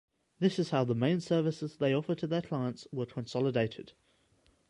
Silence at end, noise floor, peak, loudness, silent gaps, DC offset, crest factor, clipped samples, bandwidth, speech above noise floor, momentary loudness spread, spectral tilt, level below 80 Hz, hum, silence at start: 0.8 s; -69 dBFS; -14 dBFS; -32 LUFS; none; under 0.1%; 18 dB; under 0.1%; 11 kHz; 37 dB; 8 LU; -7 dB/octave; -70 dBFS; none; 0.4 s